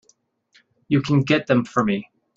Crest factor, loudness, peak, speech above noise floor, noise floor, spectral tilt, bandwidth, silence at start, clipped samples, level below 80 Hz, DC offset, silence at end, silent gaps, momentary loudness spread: 18 dB; -21 LUFS; -4 dBFS; 43 dB; -63 dBFS; -7 dB/octave; 7.6 kHz; 0.9 s; under 0.1%; -56 dBFS; under 0.1%; 0.35 s; none; 5 LU